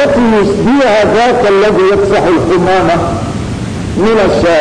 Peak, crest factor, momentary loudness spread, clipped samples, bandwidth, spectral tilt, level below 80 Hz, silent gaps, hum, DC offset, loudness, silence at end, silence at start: -4 dBFS; 4 dB; 9 LU; under 0.1%; 10.5 kHz; -6 dB/octave; -30 dBFS; none; none; under 0.1%; -9 LUFS; 0 s; 0 s